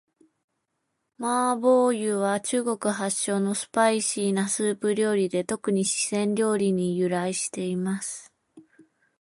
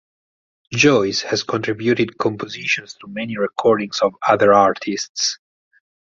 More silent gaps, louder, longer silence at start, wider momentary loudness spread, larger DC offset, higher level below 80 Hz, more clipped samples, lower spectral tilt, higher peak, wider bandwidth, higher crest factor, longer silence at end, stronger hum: second, none vs 5.09-5.15 s; second, -25 LUFS vs -18 LUFS; first, 1.2 s vs 0.7 s; second, 7 LU vs 12 LU; neither; second, -72 dBFS vs -58 dBFS; neither; about the same, -4.5 dB/octave vs -4 dB/octave; second, -8 dBFS vs -2 dBFS; first, 11.5 kHz vs 7.8 kHz; about the same, 18 dB vs 18 dB; second, 0.6 s vs 0.8 s; neither